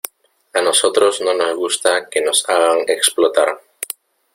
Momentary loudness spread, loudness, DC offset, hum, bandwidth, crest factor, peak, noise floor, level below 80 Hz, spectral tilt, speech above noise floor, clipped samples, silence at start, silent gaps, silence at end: 14 LU; -15 LUFS; under 0.1%; none; 16.5 kHz; 18 dB; 0 dBFS; -45 dBFS; -64 dBFS; 0 dB/octave; 29 dB; under 0.1%; 0.55 s; none; 0.5 s